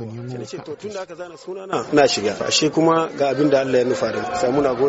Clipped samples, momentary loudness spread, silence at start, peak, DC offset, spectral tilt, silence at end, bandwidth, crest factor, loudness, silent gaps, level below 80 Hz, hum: under 0.1%; 15 LU; 0 s; -4 dBFS; under 0.1%; -3.5 dB/octave; 0 s; 8 kHz; 16 dB; -19 LUFS; none; -56 dBFS; none